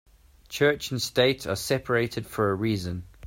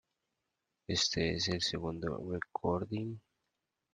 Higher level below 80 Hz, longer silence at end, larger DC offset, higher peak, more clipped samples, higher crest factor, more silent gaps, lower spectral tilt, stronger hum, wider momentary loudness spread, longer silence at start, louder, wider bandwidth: first, -54 dBFS vs -62 dBFS; second, 0 s vs 0.75 s; neither; first, -8 dBFS vs -18 dBFS; neither; about the same, 18 dB vs 20 dB; neither; about the same, -4.5 dB/octave vs -4 dB/octave; neither; second, 7 LU vs 10 LU; second, 0.5 s vs 0.9 s; first, -26 LUFS vs -35 LUFS; first, 16.5 kHz vs 9.6 kHz